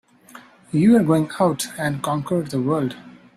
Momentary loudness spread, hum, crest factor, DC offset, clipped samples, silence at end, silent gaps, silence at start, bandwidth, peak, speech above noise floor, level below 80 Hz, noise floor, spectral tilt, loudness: 10 LU; none; 16 dB; under 0.1%; under 0.1%; 0.25 s; none; 0.35 s; 15 kHz; -4 dBFS; 27 dB; -58 dBFS; -46 dBFS; -6.5 dB/octave; -20 LUFS